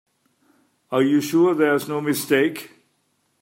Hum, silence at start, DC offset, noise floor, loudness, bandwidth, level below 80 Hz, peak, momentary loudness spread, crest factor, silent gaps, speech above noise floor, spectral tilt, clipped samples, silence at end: none; 0.9 s; under 0.1%; -68 dBFS; -20 LUFS; 16.5 kHz; -72 dBFS; -4 dBFS; 7 LU; 18 dB; none; 49 dB; -5 dB/octave; under 0.1%; 0.75 s